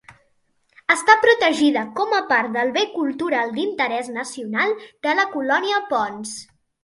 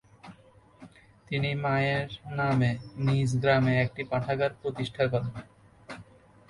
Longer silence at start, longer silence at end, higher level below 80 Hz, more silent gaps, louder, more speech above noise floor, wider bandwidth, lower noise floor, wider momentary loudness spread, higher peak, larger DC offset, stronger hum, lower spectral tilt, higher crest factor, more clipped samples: second, 0.1 s vs 0.25 s; about the same, 0.4 s vs 0.45 s; second, -68 dBFS vs -56 dBFS; neither; first, -20 LUFS vs -28 LUFS; first, 45 dB vs 29 dB; about the same, 11.5 kHz vs 11 kHz; first, -65 dBFS vs -57 dBFS; second, 13 LU vs 16 LU; first, 0 dBFS vs -12 dBFS; neither; neither; second, -2.5 dB/octave vs -7 dB/octave; about the same, 20 dB vs 18 dB; neither